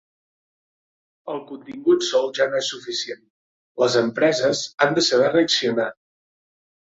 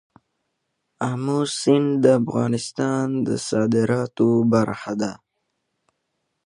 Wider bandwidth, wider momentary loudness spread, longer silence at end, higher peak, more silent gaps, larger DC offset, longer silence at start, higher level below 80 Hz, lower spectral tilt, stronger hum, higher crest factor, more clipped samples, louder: second, 8 kHz vs 11 kHz; first, 15 LU vs 9 LU; second, 0.95 s vs 1.35 s; about the same, -4 dBFS vs -2 dBFS; first, 3.30-3.75 s vs none; neither; first, 1.25 s vs 1 s; second, -68 dBFS vs -62 dBFS; second, -3.5 dB/octave vs -6 dB/octave; neither; about the same, 20 dB vs 20 dB; neither; about the same, -20 LUFS vs -21 LUFS